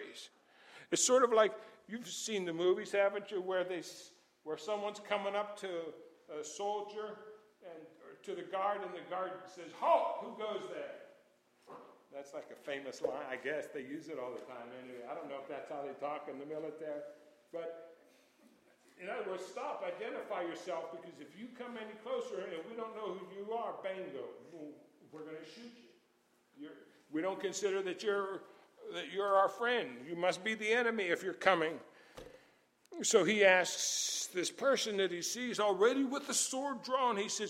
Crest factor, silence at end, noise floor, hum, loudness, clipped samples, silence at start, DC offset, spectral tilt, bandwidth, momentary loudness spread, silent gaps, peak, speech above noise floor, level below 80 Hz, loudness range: 26 dB; 0 s; -73 dBFS; none; -36 LUFS; under 0.1%; 0 s; under 0.1%; -2 dB/octave; 16 kHz; 22 LU; none; -12 dBFS; 36 dB; -84 dBFS; 13 LU